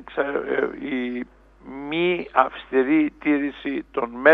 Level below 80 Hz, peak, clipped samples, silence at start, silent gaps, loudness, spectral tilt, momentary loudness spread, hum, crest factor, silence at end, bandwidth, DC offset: -54 dBFS; 0 dBFS; under 0.1%; 0 s; none; -23 LUFS; -7.5 dB/octave; 11 LU; none; 22 dB; 0 s; 4.4 kHz; under 0.1%